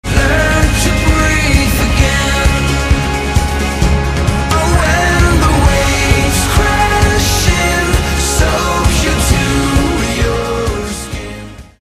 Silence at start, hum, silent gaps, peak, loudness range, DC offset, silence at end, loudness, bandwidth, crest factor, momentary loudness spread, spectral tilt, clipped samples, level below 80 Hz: 0.05 s; none; none; 0 dBFS; 2 LU; under 0.1%; 0.2 s; -12 LUFS; 16 kHz; 12 dB; 5 LU; -4.5 dB/octave; under 0.1%; -16 dBFS